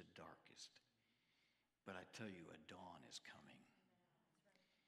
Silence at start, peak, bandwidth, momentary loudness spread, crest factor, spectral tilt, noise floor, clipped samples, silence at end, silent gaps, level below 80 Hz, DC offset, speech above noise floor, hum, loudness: 0 s; -40 dBFS; 13 kHz; 8 LU; 24 dB; -3.5 dB/octave; -85 dBFS; under 0.1%; 0.05 s; none; under -90 dBFS; under 0.1%; 26 dB; none; -59 LUFS